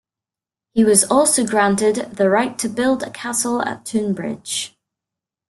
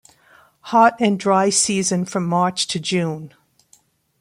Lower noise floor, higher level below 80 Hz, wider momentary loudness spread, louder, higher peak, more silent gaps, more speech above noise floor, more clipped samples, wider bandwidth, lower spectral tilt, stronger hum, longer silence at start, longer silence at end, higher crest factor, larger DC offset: first, -89 dBFS vs -57 dBFS; first, -58 dBFS vs -64 dBFS; first, 11 LU vs 7 LU; about the same, -18 LUFS vs -18 LUFS; about the same, 0 dBFS vs -2 dBFS; neither; first, 71 dB vs 39 dB; neither; second, 12.5 kHz vs 16 kHz; about the same, -3.5 dB/octave vs -4 dB/octave; neither; about the same, 0.75 s vs 0.65 s; about the same, 0.8 s vs 0.9 s; about the same, 20 dB vs 18 dB; neither